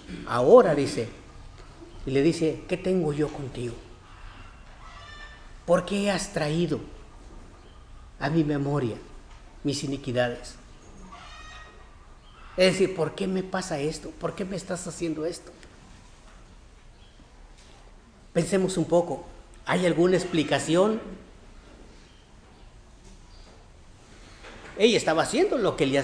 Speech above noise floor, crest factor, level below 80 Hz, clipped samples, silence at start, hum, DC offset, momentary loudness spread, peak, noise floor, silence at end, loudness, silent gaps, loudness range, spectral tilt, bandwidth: 27 dB; 24 dB; -48 dBFS; under 0.1%; 0 s; none; under 0.1%; 23 LU; -4 dBFS; -51 dBFS; 0 s; -25 LUFS; none; 9 LU; -5.5 dB/octave; 10.5 kHz